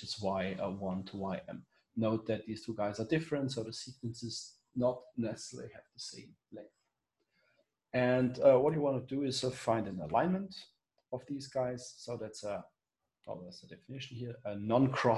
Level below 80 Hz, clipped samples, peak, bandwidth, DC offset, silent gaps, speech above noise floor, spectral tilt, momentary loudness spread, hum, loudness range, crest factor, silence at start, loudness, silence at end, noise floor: -66 dBFS; under 0.1%; -14 dBFS; 12 kHz; under 0.1%; none; 55 dB; -6 dB/octave; 18 LU; none; 11 LU; 22 dB; 0 s; -35 LUFS; 0 s; -90 dBFS